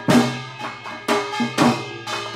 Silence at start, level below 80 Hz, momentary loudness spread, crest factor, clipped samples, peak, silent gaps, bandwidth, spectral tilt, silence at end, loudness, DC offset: 0 s; -58 dBFS; 13 LU; 18 dB; under 0.1%; -4 dBFS; none; 16 kHz; -4.5 dB/octave; 0 s; -22 LUFS; under 0.1%